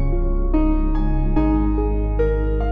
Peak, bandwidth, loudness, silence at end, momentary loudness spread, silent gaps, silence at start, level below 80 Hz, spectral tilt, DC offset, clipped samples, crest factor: -6 dBFS; 3.6 kHz; -21 LUFS; 0 s; 3 LU; none; 0 s; -20 dBFS; -11 dB/octave; under 0.1%; under 0.1%; 10 dB